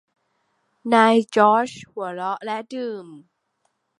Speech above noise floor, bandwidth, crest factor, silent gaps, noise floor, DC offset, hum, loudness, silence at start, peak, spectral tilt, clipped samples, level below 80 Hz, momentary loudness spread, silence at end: 51 dB; 11 kHz; 22 dB; none; -72 dBFS; under 0.1%; none; -20 LUFS; 0.85 s; -2 dBFS; -5 dB/octave; under 0.1%; -72 dBFS; 16 LU; 0.8 s